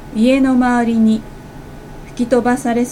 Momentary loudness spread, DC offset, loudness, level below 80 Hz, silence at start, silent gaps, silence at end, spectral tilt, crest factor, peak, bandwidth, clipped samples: 22 LU; under 0.1%; -15 LUFS; -38 dBFS; 0 s; none; 0 s; -6 dB/octave; 14 dB; -2 dBFS; 12.5 kHz; under 0.1%